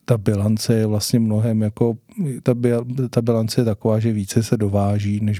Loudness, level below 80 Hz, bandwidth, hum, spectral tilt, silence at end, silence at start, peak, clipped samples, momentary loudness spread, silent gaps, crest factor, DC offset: -20 LUFS; -54 dBFS; 15 kHz; none; -7 dB/octave; 0 s; 0.1 s; -2 dBFS; under 0.1%; 3 LU; none; 16 dB; under 0.1%